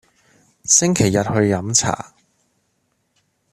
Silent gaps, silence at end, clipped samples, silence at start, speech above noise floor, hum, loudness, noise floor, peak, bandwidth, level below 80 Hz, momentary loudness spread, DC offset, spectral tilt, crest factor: none; 1.5 s; under 0.1%; 0.65 s; 51 dB; none; -16 LUFS; -68 dBFS; 0 dBFS; 14.5 kHz; -50 dBFS; 16 LU; under 0.1%; -3.5 dB/octave; 20 dB